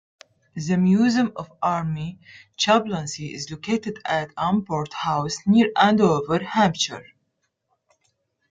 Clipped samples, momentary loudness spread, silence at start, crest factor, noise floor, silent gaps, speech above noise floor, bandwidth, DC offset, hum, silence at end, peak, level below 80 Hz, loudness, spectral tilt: under 0.1%; 13 LU; 0.55 s; 20 dB; -74 dBFS; none; 52 dB; 9.2 kHz; under 0.1%; none; 1.5 s; -2 dBFS; -58 dBFS; -22 LUFS; -5 dB/octave